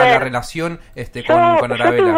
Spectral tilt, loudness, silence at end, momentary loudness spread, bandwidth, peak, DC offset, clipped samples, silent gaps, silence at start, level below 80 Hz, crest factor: -5.5 dB/octave; -16 LUFS; 0 s; 15 LU; 15.5 kHz; -2 dBFS; under 0.1%; under 0.1%; none; 0 s; -42 dBFS; 14 dB